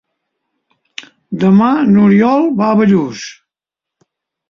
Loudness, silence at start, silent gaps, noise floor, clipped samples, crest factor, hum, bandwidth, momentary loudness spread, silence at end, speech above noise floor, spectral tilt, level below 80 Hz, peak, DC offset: -11 LUFS; 1 s; none; -84 dBFS; under 0.1%; 12 dB; none; 7 kHz; 22 LU; 1.2 s; 74 dB; -7.5 dB/octave; -54 dBFS; -2 dBFS; under 0.1%